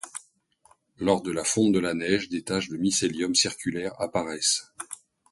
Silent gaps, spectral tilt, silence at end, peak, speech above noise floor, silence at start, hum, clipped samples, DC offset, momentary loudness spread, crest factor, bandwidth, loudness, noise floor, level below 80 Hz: none; -3 dB/octave; 0.35 s; -8 dBFS; 37 dB; 0.05 s; none; under 0.1%; under 0.1%; 16 LU; 20 dB; 12 kHz; -25 LUFS; -63 dBFS; -60 dBFS